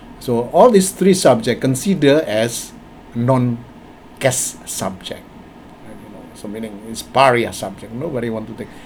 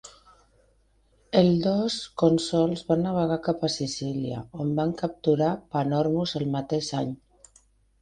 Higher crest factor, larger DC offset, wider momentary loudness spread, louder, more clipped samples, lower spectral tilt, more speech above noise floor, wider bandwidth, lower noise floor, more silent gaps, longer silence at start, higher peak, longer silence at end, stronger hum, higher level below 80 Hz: about the same, 18 dB vs 22 dB; neither; first, 19 LU vs 8 LU; first, -16 LUFS vs -26 LUFS; neither; second, -5 dB/octave vs -6.5 dB/octave; second, 23 dB vs 39 dB; first, over 20 kHz vs 10 kHz; second, -40 dBFS vs -64 dBFS; neither; about the same, 0 s vs 0.05 s; first, 0 dBFS vs -6 dBFS; second, 0 s vs 0.85 s; neither; first, -48 dBFS vs -56 dBFS